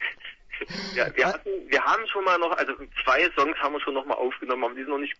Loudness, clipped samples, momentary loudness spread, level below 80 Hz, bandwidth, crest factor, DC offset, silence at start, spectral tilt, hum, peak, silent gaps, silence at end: -25 LUFS; under 0.1%; 11 LU; -54 dBFS; 7.8 kHz; 18 dB; under 0.1%; 0 s; -3.5 dB/octave; none; -8 dBFS; none; 0.05 s